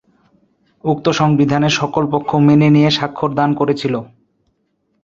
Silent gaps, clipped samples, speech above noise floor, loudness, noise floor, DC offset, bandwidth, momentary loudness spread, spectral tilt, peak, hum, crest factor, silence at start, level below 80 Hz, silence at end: none; under 0.1%; 52 dB; -15 LUFS; -65 dBFS; under 0.1%; 7.6 kHz; 9 LU; -6.5 dB/octave; -2 dBFS; none; 14 dB; 0.85 s; -52 dBFS; 0.95 s